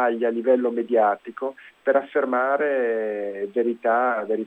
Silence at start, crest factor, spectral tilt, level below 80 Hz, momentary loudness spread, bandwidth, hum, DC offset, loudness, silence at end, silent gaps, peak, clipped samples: 0 s; 16 dB; -7.5 dB/octave; -80 dBFS; 8 LU; 4 kHz; none; under 0.1%; -23 LUFS; 0 s; none; -6 dBFS; under 0.1%